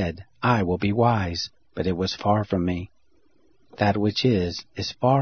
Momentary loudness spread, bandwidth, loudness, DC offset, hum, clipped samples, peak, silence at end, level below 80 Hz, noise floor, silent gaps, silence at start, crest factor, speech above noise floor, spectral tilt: 9 LU; 6.6 kHz; -24 LUFS; under 0.1%; none; under 0.1%; -4 dBFS; 0 s; -48 dBFS; -66 dBFS; none; 0 s; 20 dB; 43 dB; -6.5 dB/octave